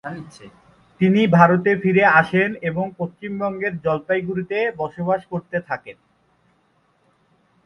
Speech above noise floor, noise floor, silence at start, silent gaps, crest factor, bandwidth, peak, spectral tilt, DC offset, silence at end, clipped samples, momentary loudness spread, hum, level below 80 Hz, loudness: 43 dB; -63 dBFS; 0.05 s; none; 20 dB; 6.6 kHz; 0 dBFS; -8 dB/octave; under 0.1%; 1.75 s; under 0.1%; 15 LU; none; -60 dBFS; -19 LUFS